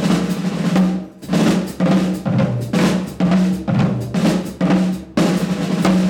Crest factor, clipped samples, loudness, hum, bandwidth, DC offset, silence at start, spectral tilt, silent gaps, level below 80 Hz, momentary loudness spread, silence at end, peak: 14 dB; under 0.1%; -18 LUFS; none; 16 kHz; under 0.1%; 0 s; -6.5 dB/octave; none; -44 dBFS; 4 LU; 0 s; -2 dBFS